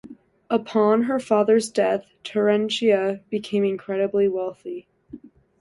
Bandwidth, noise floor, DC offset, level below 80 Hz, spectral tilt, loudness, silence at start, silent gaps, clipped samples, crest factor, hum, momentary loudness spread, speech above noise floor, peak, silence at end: 11.5 kHz; -44 dBFS; under 0.1%; -66 dBFS; -5.5 dB/octave; -22 LUFS; 0.05 s; none; under 0.1%; 16 dB; none; 10 LU; 23 dB; -6 dBFS; 0.45 s